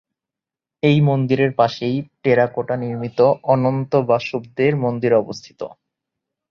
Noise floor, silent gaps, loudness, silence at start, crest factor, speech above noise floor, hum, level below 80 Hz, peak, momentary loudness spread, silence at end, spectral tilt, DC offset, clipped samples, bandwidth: -88 dBFS; none; -18 LUFS; 0.85 s; 18 dB; 70 dB; none; -58 dBFS; -2 dBFS; 10 LU; 0.85 s; -8 dB/octave; under 0.1%; under 0.1%; 7 kHz